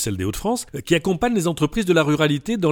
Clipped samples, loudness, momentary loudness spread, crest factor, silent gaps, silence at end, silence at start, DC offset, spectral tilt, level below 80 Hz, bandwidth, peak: under 0.1%; -21 LUFS; 6 LU; 16 dB; none; 0 s; 0 s; under 0.1%; -5 dB/octave; -42 dBFS; 19 kHz; -4 dBFS